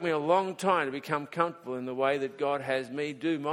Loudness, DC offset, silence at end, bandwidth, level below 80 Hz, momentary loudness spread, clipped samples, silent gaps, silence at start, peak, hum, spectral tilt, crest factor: -30 LUFS; under 0.1%; 0 s; 16 kHz; -76 dBFS; 7 LU; under 0.1%; none; 0 s; -10 dBFS; none; -5.5 dB/octave; 20 dB